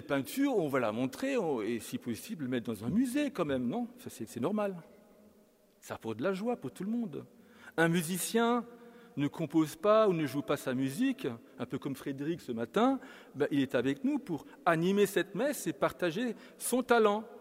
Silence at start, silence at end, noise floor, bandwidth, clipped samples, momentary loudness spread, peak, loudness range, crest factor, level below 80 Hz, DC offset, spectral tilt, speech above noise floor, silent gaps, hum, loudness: 0 s; 0 s; -65 dBFS; 16 kHz; under 0.1%; 12 LU; -12 dBFS; 6 LU; 20 dB; -72 dBFS; under 0.1%; -5.5 dB/octave; 32 dB; none; none; -32 LUFS